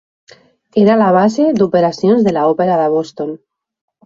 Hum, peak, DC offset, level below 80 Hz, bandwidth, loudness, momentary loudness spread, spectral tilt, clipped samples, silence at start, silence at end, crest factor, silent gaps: none; -2 dBFS; under 0.1%; -56 dBFS; 7.6 kHz; -13 LUFS; 13 LU; -7.5 dB/octave; under 0.1%; 0.75 s; 0.7 s; 12 dB; none